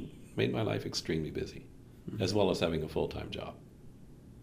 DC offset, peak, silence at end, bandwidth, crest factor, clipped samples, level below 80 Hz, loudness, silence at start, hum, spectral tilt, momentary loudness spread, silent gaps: under 0.1%; -14 dBFS; 0 s; 15.5 kHz; 22 dB; under 0.1%; -54 dBFS; -34 LUFS; 0 s; none; -5.5 dB/octave; 24 LU; none